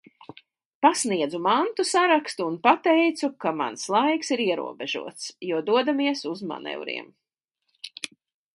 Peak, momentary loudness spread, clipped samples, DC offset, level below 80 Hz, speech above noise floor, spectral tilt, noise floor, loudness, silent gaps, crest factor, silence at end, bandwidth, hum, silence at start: -4 dBFS; 14 LU; under 0.1%; under 0.1%; -80 dBFS; 55 dB; -3 dB/octave; -79 dBFS; -24 LUFS; 7.44-7.48 s; 22 dB; 0.45 s; 11.5 kHz; none; 0.8 s